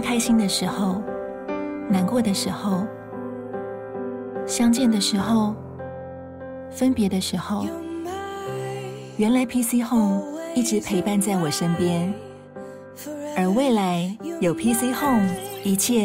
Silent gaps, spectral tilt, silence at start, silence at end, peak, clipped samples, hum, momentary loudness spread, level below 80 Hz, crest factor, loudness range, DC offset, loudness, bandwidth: none; -5 dB/octave; 0 s; 0 s; -10 dBFS; under 0.1%; none; 15 LU; -54 dBFS; 12 dB; 4 LU; under 0.1%; -23 LUFS; 16 kHz